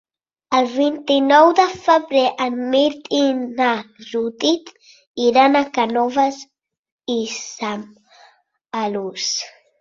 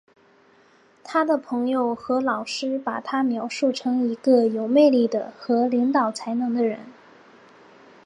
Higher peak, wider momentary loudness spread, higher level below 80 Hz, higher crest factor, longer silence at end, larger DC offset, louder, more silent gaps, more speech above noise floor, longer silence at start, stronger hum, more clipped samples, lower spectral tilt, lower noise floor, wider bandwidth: first, 0 dBFS vs -6 dBFS; first, 13 LU vs 9 LU; first, -64 dBFS vs -76 dBFS; about the same, 18 dB vs 18 dB; second, 0.3 s vs 1.15 s; neither; first, -18 LUFS vs -22 LUFS; first, 5.07-5.14 s, 6.78-6.83 s, 6.92-6.98 s vs none; about the same, 37 dB vs 35 dB; second, 0.5 s vs 1.05 s; neither; neither; second, -3 dB/octave vs -5 dB/octave; about the same, -54 dBFS vs -56 dBFS; second, 7.6 kHz vs 10.5 kHz